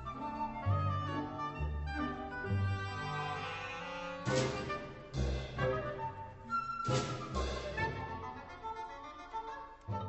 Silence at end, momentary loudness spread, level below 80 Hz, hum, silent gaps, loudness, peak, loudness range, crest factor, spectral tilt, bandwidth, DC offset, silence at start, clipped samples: 0 s; 10 LU; -48 dBFS; none; none; -39 LUFS; -20 dBFS; 2 LU; 18 dB; -5.5 dB/octave; 8.2 kHz; under 0.1%; 0 s; under 0.1%